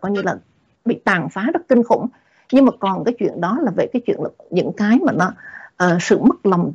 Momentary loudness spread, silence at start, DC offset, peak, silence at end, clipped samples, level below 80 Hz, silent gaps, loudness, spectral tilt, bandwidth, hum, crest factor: 10 LU; 0 s; under 0.1%; -4 dBFS; 0 s; under 0.1%; -58 dBFS; none; -18 LUFS; -6.5 dB/octave; 7.8 kHz; none; 14 dB